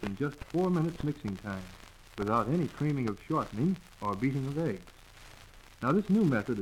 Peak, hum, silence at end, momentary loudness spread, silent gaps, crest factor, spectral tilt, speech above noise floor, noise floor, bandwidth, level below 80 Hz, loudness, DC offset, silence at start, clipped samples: -16 dBFS; none; 0 s; 14 LU; none; 16 dB; -8 dB/octave; 22 dB; -53 dBFS; 15.5 kHz; -54 dBFS; -32 LUFS; under 0.1%; 0 s; under 0.1%